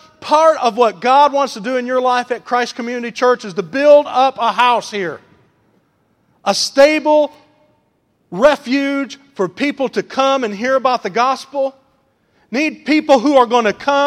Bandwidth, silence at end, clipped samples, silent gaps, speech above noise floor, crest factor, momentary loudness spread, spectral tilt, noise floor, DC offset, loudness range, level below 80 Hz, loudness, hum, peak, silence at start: 13 kHz; 0 s; under 0.1%; none; 47 dB; 16 dB; 12 LU; -3.5 dB/octave; -61 dBFS; under 0.1%; 3 LU; -58 dBFS; -15 LUFS; none; 0 dBFS; 0.2 s